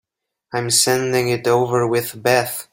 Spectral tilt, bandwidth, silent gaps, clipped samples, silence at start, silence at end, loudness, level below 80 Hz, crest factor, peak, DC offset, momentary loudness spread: -3.5 dB/octave; 16.5 kHz; none; under 0.1%; 0.5 s; 0.1 s; -18 LUFS; -58 dBFS; 16 dB; -2 dBFS; under 0.1%; 6 LU